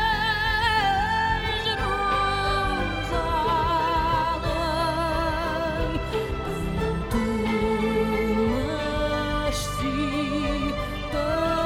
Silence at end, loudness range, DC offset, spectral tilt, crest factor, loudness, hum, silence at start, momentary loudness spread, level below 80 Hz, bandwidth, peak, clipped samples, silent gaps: 0 s; 2 LU; under 0.1%; -5 dB/octave; 16 dB; -25 LUFS; none; 0 s; 5 LU; -34 dBFS; 18 kHz; -10 dBFS; under 0.1%; none